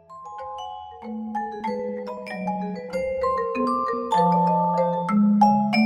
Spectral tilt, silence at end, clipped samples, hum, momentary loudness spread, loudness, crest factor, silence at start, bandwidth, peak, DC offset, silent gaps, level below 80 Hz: -7.5 dB/octave; 0 s; under 0.1%; none; 17 LU; -23 LUFS; 18 dB; 0.1 s; 11 kHz; -6 dBFS; under 0.1%; none; -58 dBFS